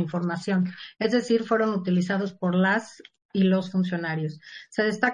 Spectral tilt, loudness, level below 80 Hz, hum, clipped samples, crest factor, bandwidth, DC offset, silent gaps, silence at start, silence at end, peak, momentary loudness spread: -7 dB/octave; -25 LUFS; -72 dBFS; none; under 0.1%; 18 dB; 9.6 kHz; under 0.1%; 3.25-3.29 s; 0 s; 0 s; -8 dBFS; 9 LU